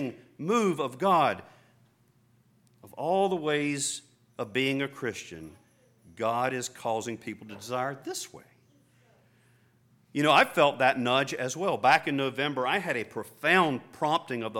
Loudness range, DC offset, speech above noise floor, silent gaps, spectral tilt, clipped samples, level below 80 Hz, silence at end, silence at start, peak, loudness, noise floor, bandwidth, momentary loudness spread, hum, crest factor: 8 LU; under 0.1%; 37 dB; none; -4 dB/octave; under 0.1%; -74 dBFS; 0 s; 0 s; -8 dBFS; -27 LUFS; -65 dBFS; 17.5 kHz; 16 LU; 60 Hz at -65 dBFS; 20 dB